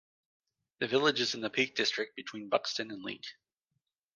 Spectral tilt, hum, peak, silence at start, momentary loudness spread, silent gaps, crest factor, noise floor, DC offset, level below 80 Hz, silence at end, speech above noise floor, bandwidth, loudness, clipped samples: -3 dB/octave; none; -12 dBFS; 0.8 s; 14 LU; none; 22 dB; -84 dBFS; under 0.1%; -82 dBFS; 0.85 s; 51 dB; 10 kHz; -32 LUFS; under 0.1%